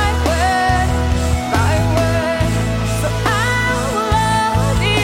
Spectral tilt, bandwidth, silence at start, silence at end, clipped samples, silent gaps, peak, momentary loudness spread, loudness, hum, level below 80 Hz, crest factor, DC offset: -5 dB/octave; 16.5 kHz; 0 s; 0 s; under 0.1%; none; -4 dBFS; 3 LU; -16 LUFS; none; -24 dBFS; 12 dB; under 0.1%